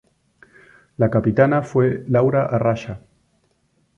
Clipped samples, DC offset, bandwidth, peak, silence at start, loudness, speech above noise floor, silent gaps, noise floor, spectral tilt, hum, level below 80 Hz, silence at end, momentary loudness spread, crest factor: under 0.1%; under 0.1%; 7.4 kHz; -4 dBFS; 1 s; -19 LUFS; 46 dB; none; -64 dBFS; -9 dB/octave; none; -50 dBFS; 1 s; 10 LU; 18 dB